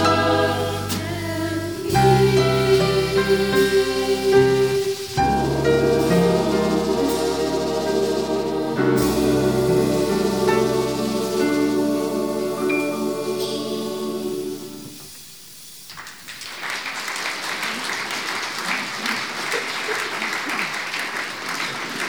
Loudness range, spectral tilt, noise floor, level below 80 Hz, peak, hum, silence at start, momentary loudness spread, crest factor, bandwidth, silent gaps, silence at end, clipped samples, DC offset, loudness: 10 LU; -5 dB/octave; -41 dBFS; -44 dBFS; -4 dBFS; none; 0 s; 10 LU; 18 dB; over 20 kHz; none; 0 s; under 0.1%; 0.3%; -21 LUFS